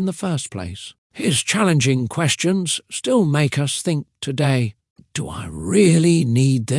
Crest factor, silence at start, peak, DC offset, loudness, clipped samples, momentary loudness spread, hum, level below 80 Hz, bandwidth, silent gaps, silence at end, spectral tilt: 16 dB; 0 s; -2 dBFS; under 0.1%; -19 LUFS; under 0.1%; 13 LU; none; -54 dBFS; 12 kHz; 0.98-1.10 s, 4.90-4.96 s; 0 s; -5 dB/octave